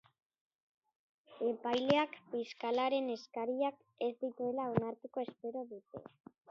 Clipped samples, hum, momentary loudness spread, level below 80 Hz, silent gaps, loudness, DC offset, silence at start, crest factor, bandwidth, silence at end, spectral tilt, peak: under 0.1%; none; 12 LU; -76 dBFS; none; -37 LUFS; under 0.1%; 1.3 s; 24 dB; 7.4 kHz; 0.45 s; -4 dB/octave; -14 dBFS